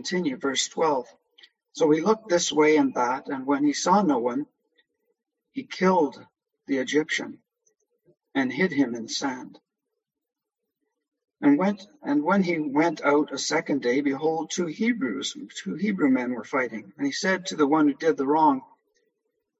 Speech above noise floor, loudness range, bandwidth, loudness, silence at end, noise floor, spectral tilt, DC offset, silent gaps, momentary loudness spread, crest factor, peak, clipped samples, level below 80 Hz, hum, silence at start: 60 dB; 6 LU; 8.2 kHz; -24 LUFS; 0.95 s; -84 dBFS; -4.5 dB/octave; under 0.1%; none; 10 LU; 18 dB; -8 dBFS; under 0.1%; -74 dBFS; none; 0 s